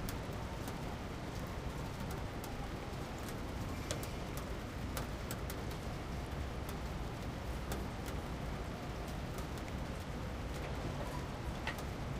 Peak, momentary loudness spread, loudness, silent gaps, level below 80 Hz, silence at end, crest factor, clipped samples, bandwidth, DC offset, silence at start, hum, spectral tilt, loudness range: -20 dBFS; 2 LU; -43 LUFS; none; -46 dBFS; 0 s; 20 dB; under 0.1%; 16 kHz; under 0.1%; 0 s; none; -5.5 dB/octave; 1 LU